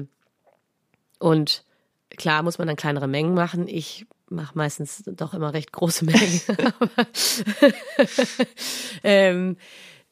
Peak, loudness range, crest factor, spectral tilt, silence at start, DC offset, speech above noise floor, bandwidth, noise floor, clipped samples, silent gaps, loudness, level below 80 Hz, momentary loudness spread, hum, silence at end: -4 dBFS; 6 LU; 20 dB; -4.5 dB/octave; 0 s; under 0.1%; 48 dB; 15.5 kHz; -70 dBFS; under 0.1%; none; -22 LUFS; -70 dBFS; 14 LU; none; 0.2 s